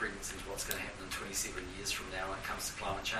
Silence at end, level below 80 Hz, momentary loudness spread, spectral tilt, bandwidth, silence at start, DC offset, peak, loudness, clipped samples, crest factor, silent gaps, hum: 0 s; -52 dBFS; 4 LU; -2 dB/octave; 15 kHz; 0 s; under 0.1%; -18 dBFS; -39 LUFS; under 0.1%; 22 dB; none; none